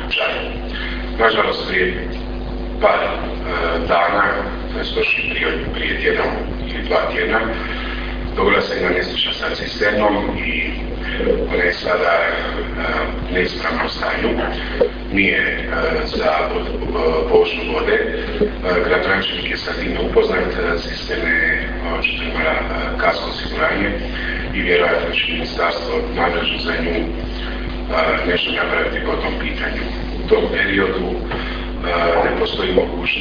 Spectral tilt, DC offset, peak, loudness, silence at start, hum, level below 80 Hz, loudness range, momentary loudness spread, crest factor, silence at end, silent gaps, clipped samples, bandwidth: -6 dB/octave; under 0.1%; 0 dBFS; -18 LUFS; 0 s; none; -28 dBFS; 2 LU; 9 LU; 18 dB; 0 s; none; under 0.1%; 5.2 kHz